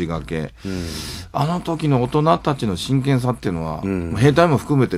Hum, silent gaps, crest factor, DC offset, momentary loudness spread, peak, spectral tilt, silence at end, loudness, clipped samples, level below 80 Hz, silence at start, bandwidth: none; none; 18 dB; under 0.1%; 11 LU; 0 dBFS; -7 dB/octave; 0 s; -20 LUFS; under 0.1%; -42 dBFS; 0 s; 14.5 kHz